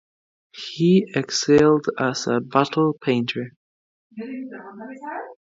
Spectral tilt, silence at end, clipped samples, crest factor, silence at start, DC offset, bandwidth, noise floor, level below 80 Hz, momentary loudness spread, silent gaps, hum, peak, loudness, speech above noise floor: -5.5 dB/octave; 0.25 s; under 0.1%; 20 dB; 0.55 s; under 0.1%; 7.8 kHz; under -90 dBFS; -60 dBFS; 20 LU; 3.56-4.10 s; none; -2 dBFS; -20 LUFS; over 69 dB